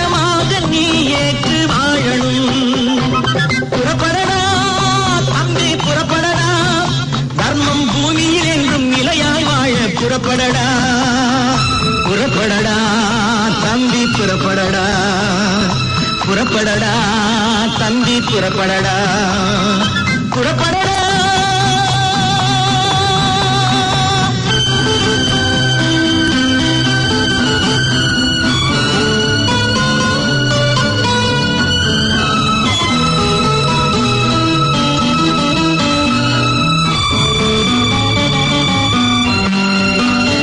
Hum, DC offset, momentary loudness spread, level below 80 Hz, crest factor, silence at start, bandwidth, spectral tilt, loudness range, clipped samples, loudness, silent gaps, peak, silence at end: none; under 0.1%; 2 LU; -34 dBFS; 12 dB; 0 s; 11 kHz; -4 dB/octave; 1 LU; under 0.1%; -13 LUFS; none; -2 dBFS; 0 s